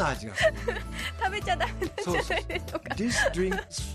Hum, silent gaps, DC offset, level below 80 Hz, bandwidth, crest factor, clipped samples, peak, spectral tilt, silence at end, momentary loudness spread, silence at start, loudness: none; none; under 0.1%; -40 dBFS; 15 kHz; 16 dB; under 0.1%; -12 dBFS; -4 dB/octave; 0 s; 8 LU; 0 s; -29 LUFS